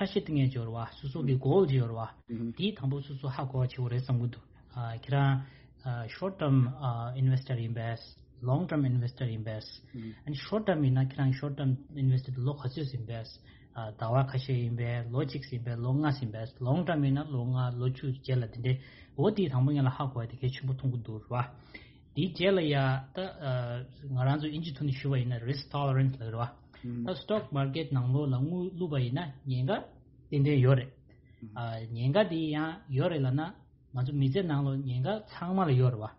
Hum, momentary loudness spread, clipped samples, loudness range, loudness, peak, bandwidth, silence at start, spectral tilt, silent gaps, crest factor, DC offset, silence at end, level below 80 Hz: none; 12 LU; under 0.1%; 3 LU; -32 LUFS; -12 dBFS; 5.8 kHz; 0 s; -7 dB/octave; none; 18 dB; under 0.1%; 0.05 s; -58 dBFS